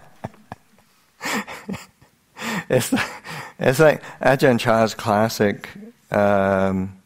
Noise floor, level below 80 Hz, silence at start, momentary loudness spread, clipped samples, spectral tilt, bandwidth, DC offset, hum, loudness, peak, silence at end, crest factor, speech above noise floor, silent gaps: -58 dBFS; -52 dBFS; 0.25 s; 18 LU; under 0.1%; -5.5 dB/octave; 16 kHz; under 0.1%; none; -20 LUFS; -2 dBFS; 0.1 s; 20 dB; 39 dB; none